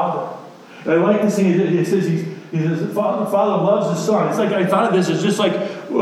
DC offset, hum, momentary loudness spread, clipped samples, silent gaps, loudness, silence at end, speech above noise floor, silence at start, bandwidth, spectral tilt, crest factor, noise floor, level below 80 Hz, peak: under 0.1%; none; 8 LU; under 0.1%; none; -18 LUFS; 0 s; 21 dB; 0 s; 14 kHz; -6.5 dB/octave; 14 dB; -38 dBFS; -70 dBFS; -4 dBFS